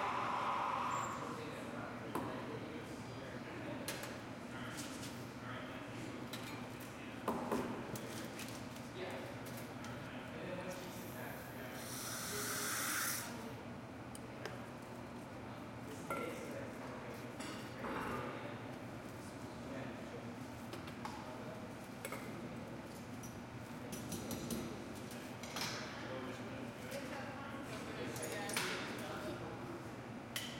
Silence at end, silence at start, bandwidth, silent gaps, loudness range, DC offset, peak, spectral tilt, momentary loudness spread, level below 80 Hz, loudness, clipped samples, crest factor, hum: 0 s; 0 s; 16.5 kHz; none; 6 LU; under 0.1%; -22 dBFS; -4 dB/octave; 10 LU; -68 dBFS; -45 LUFS; under 0.1%; 24 dB; none